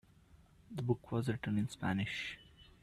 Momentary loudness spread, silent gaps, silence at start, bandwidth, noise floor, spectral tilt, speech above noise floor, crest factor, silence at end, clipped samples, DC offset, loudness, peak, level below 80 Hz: 9 LU; none; 0.35 s; 13.5 kHz; -64 dBFS; -6.5 dB/octave; 27 dB; 20 dB; 0.2 s; under 0.1%; under 0.1%; -38 LUFS; -20 dBFS; -64 dBFS